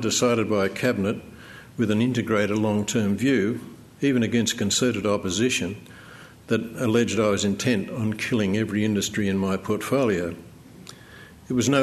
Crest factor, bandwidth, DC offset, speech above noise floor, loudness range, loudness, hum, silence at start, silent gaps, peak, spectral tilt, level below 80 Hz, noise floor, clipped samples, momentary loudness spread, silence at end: 18 dB; 13.5 kHz; under 0.1%; 23 dB; 2 LU; -24 LUFS; none; 0 s; none; -6 dBFS; -4.5 dB/octave; -58 dBFS; -46 dBFS; under 0.1%; 18 LU; 0 s